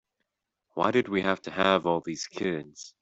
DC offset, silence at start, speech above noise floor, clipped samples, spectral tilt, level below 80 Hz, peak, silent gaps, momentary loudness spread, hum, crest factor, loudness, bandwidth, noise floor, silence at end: under 0.1%; 0.75 s; 55 dB; under 0.1%; -4.5 dB/octave; -66 dBFS; -6 dBFS; none; 12 LU; none; 22 dB; -27 LUFS; 8 kHz; -82 dBFS; 0.15 s